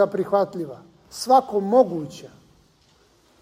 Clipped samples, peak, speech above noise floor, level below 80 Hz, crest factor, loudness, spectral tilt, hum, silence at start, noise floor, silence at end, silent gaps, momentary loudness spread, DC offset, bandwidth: under 0.1%; -4 dBFS; 38 dB; -64 dBFS; 20 dB; -21 LUFS; -6 dB/octave; none; 0 s; -59 dBFS; 1.15 s; none; 19 LU; under 0.1%; 16 kHz